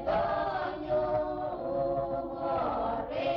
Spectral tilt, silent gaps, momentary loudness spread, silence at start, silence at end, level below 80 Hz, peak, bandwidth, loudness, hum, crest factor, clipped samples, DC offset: -8 dB/octave; none; 5 LU; 0 s; 0 s; -52 dBFS; -20 dBFS; 6 kHz; -32 LUFS; none; 12 dB; under 0.1%; under 0.1%